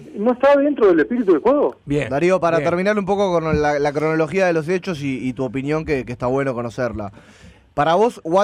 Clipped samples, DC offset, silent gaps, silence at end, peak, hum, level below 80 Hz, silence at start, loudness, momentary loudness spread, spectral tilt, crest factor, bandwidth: under 0.1%; under 0.1%; none; 0 s; -6 dBFS; none; -44 dBFS; 0 s; -18 LUFS; 9 LU; -7 dB/octave; 12 dB; 11.5 kHz